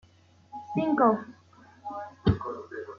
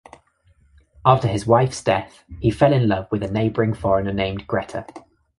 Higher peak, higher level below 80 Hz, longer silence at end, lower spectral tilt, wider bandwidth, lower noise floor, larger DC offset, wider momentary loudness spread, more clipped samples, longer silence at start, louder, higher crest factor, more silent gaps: second, -10 dBFS vs -2 dBFS; second, -50 dBFS vs -44 dBFS; second, 0 s vs 0.4 s; first, -9 dB/octave vs -7 dB/octave; second, 7 kHz vs 11.5 kHz; about the same, -59 dBFS vs -58 dBFS; neither; first, 22 LU vs 9 LU; neither; second, 0.55 s vs 1.05 s; second, -28 LUFS vs -20 LUFS; about the same, 20 dB vs 20 dB; neither